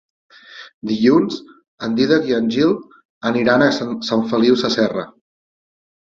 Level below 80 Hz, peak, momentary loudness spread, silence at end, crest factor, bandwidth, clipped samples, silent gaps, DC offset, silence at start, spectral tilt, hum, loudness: -58 dBFS; -2 dBFS; 15 LU; 1.05 s; 18 dB; 7.4 kHz; under 0.1%; 0.74-0.81 s, 1.68-1.78 s, 3.05-3.21 s; under 0.1%; 0.5 s; -5.5 dB/octave; none; -17 LUFS